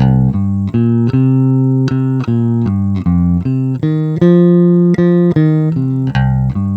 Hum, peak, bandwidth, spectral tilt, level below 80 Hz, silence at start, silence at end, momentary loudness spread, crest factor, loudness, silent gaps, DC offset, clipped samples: none; 0 dBFS; 5 kHz; -10.5 dB/octave; -32 dBFS; 0 s; 0 s; 6 LU; 12 dB; -12 LUFS; none; under 0.1%; under 0.1%